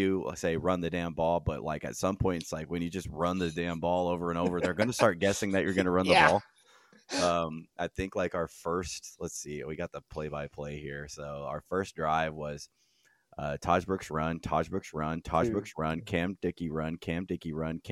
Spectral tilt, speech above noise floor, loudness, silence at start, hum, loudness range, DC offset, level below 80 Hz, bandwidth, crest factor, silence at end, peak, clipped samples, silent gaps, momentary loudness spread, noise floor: -5 dB/octave; 33 dB; -31 LUFS; 0 s; none; 9 LU; under 0.1%; -52 dBFS; 15 kHz; 24 dB; 0 s; -6 dBFS; under 0.1%; none; 12 LU; -65 dBFS